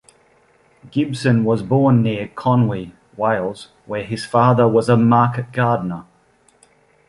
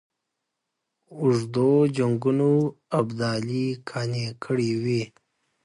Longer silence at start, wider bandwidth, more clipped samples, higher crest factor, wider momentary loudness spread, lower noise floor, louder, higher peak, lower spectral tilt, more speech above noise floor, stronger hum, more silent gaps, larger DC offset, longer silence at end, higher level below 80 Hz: second, 0.85 s vs 1.1 s; about the same, 11.5 kHz vs 11 kHz; neither; about the same, 16 dB vs 16 dB; first, 14 LU vs 8 LU; second, -56 dBFS vs -82 dBFS; first, -18 LUFS vs -24 LUFS; first, -2 dBFS vs -8 dBFS; about the same, -8 dB/octave vs -7 dB/octave; second, 40 dB vs 58 dB; neither; neither; neither; first, 1.05 s vs 0.55 s; first, -54 dBFS vs -64 dBFS